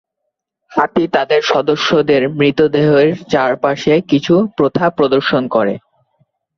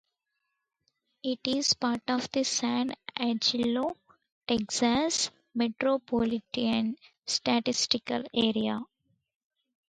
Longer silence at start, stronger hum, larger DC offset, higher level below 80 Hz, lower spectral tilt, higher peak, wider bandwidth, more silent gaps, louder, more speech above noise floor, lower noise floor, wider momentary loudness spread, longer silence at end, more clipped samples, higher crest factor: second, 0.7 s vs 1.25 s; neither; neither; first, -52 dBFS vs -64 dBFS; first, -6 dB/octave vs -3 dB/octave; first, 0 dBFS vs -10 dBFS; second, 7.2 kHz vs 9.4 kHz; second, none vs 4.32-4.41 s; first, -14 LUFS vs -29 LUFS; first, 62 dB vs 54 dB; second, -75 dBFS vs -82 dBFS; second, 4 LU vs 8 LU; second, 0.8 s vs 1.05 s; neither; second, 14 dB vs 22 dB